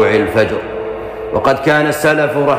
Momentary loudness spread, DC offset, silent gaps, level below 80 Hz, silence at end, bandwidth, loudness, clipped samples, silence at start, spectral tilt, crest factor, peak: 11 LU; under 0.1%; none; -42 dBFS; 0 s; 15.5 kHz; -14 LUFS; under 0.1%; 0 s; -5.5 dB/octave; 12 dB; -2 dBFS